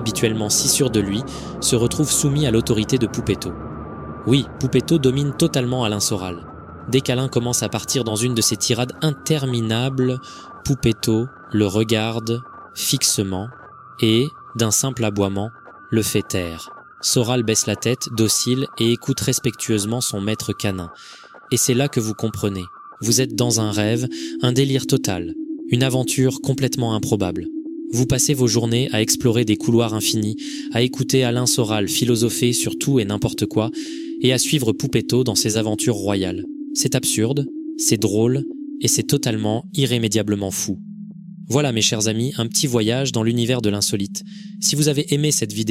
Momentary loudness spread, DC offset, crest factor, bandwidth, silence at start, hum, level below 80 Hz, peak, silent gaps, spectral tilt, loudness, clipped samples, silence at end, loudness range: 11 LU; under 0.1%; 18 dB; 16.5 kHz; 0 s; none; -48 dBFS; -2 dBFS; none; -4.5 dB/octave; -20 LUFS; under 0.1%; 0 s; 2 LU